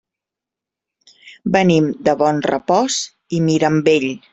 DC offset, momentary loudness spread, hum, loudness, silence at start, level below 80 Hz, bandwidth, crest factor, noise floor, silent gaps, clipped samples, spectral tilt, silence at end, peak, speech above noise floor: under 0.1%; 6 LU; none; -16 LUFS; 1.25 s; -56 dBFS; 8.2 kHz; 16 dB; -86 dBFS; none; under 0.1%; -5 dB/octave; 0.15 s; -2 dBFS; 70 dB